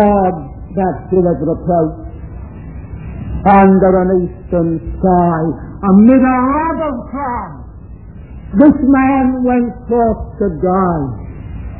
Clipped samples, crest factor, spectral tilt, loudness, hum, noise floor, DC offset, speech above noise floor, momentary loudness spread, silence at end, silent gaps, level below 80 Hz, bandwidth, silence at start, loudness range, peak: 0.1%; 14 dB; -13 dB/octave; -13 LUFS; none; -32 dBFS; 0.5%; 20 dB; 21 LU; 0 s; none; -30 dBFS; 4 kHz; 0 s; 3 LU; 0 dBFS